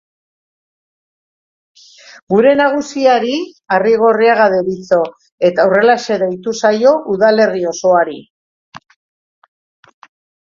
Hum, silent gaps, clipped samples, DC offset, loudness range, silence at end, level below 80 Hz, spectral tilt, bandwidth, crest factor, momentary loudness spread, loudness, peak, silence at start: none; 5.32-5.38 s, 8.30-8.72 s; under 0.1%; under 0.1%; 4 LU; 1.65 s; -60 dBFS; -5 dB/octave; 7.6 kHz; 14 dB; 7 LU; -13 LUFS; 0 dBFS; 2.3 s